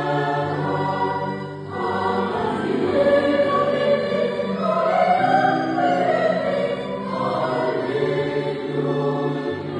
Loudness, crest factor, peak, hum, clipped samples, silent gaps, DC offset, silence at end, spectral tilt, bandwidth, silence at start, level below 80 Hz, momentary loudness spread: -21 LUFS; 16 dB; -4 dBFS; none; under 0.1%; none; under 0.1%; 0 s; -7 dB/octave; 9.8 kHz; 0 s; -58 dBFS; 7 LU